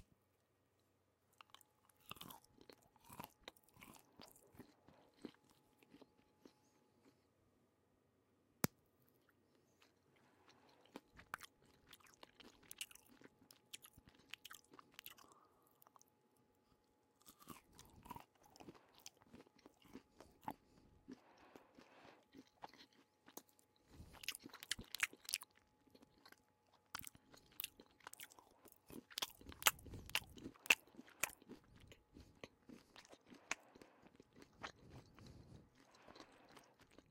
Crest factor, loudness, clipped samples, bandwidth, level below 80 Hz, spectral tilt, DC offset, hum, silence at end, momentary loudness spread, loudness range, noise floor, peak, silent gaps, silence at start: 42 dB; -46 LUFS; under 0.1%; 16.5 kHz; -76 dBFS; -1.5 dB/octave; under 0.1%; none; 0.1 s; 23 LU; 21 LU; -81 dBFS; -12 dBFS; none; 2.05 s